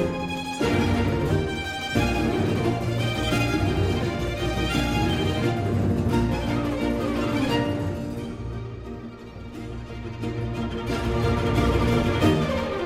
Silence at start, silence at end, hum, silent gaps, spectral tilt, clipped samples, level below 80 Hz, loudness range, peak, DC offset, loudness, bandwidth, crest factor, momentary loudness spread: 0 s; 0 s; none; none; -6.5 dB/octave; under 0.1%; -36 dBFS; 6 LU; -8 dBFS; under 0.1%; -25 LUFS; 16 kHz; 16 dB; 13 LU